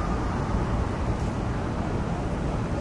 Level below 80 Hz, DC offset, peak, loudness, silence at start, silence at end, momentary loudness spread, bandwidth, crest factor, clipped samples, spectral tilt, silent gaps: -32 dBFS; under 0.1%; -14 dBFS; -28 LUFS; 0 s; 0 s; 2 LU; 11 kHz; 14 dB; under 0.1%; -7.5 dB/octave; none